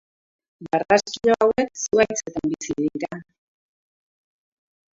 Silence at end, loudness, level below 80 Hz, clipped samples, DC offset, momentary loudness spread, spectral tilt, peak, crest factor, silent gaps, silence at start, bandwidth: 1.75 s; -22 LUFS; -58 dBFS; under 0.1%; under 0.1%; 10 LU; -4 dB/octave; -4 dBFS; 22 dB; none; 0.6 s; 7.8 kHz